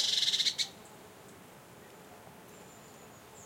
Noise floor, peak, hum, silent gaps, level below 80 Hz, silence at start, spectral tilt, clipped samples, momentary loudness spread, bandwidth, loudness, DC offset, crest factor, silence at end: -53 dBFS; -16 dBFS; none; none; -76 dBFS; 0 s; 0.5 dB/octave; under 0.1%; 26 LU; 16.5 kHz; -29 LUFS; under 0.1%; 22 dB; 0 s